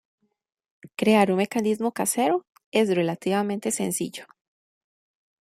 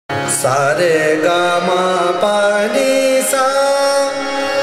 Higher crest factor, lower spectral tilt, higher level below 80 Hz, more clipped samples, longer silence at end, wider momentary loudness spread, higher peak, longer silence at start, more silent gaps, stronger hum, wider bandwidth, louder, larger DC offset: first, 20 dB vs 12 dB; first, -4.5 dB/octave vs -3 dB/octave; second, -70 dBFS vs -60 dBFS; neither; first, 1.15 s vs 0 s; first, 9 LU vs 3 LU; second, -6 dBFS vs -2 dBFS; first, 0.85 s vs 0.1 s; first, 2.66-2.72 s vs none; neither; about the same, 16 kHz vs 16 kHz; second, -24 LUFS vs -14 LUFS; neither